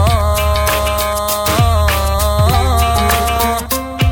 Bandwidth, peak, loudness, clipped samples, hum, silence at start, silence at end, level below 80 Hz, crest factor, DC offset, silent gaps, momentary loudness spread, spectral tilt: 18 kHz; 0 dBFS; -14 LUFS; under 0.1%; none; 0 s; 0 s; -18 dBFS; 12 dB; under 0.1%; none; 3 LU; -4.5 dB/octave